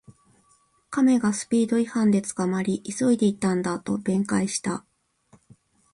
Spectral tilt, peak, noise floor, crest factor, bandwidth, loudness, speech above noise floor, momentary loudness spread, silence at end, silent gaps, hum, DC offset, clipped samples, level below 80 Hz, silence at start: -5.5 dB/octave; -10 dBFS; -63 dBFS; 14 dB; 11.5 kHz; -24 LUFS; 40 dB; 7 LU; 1.15 s; none; none; under 0.1%; under 0.1%; -62 dBFS; 0.9 s